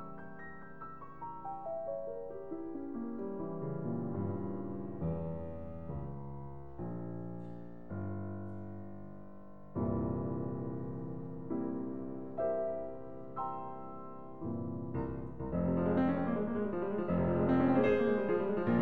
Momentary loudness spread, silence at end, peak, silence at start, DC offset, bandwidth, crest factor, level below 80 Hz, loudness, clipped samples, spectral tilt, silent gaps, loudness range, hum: 17 LU; 0 s; -18 dBFS; 0 s; 0.4%; 4.6 kHz; 20 dB; -56 dBFS; -37 LUFS; under 0.1%; -11 dB/octave; none; 11 LU; none